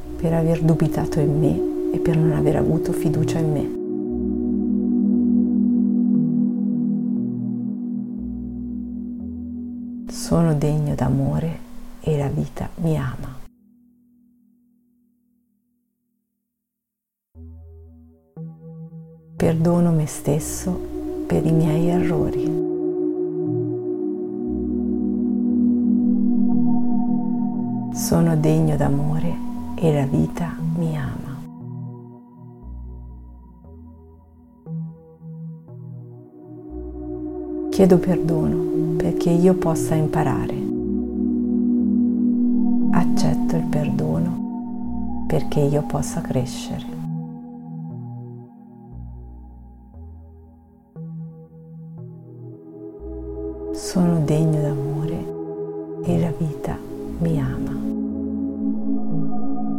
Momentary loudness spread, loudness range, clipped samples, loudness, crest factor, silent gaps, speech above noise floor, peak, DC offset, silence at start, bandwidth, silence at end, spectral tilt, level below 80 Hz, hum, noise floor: 20 LU; 18 LU; under 0.1%; -22 LUFS; 20 dB; none; 64 dB; -2 dBFS; under 0.1%; 0 s; 15.5 kHz; 0 s; -8 dB/octave; -40 dBFS; none; -83 dBFS